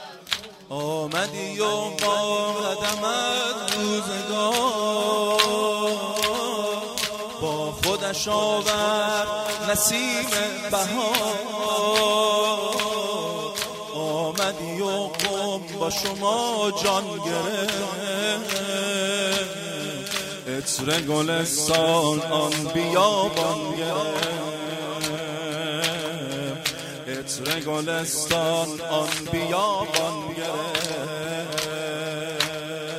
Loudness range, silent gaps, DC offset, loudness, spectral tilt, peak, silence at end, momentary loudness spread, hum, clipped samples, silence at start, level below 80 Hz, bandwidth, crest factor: 4 LU; none; under 0.1%; -24 LUFS; -2.5 dB/octave; -2 dBFS; 0 s; 9 LU; none; under 0.1%; 0 s; -58 dBFS; 16 kHz; 24 dB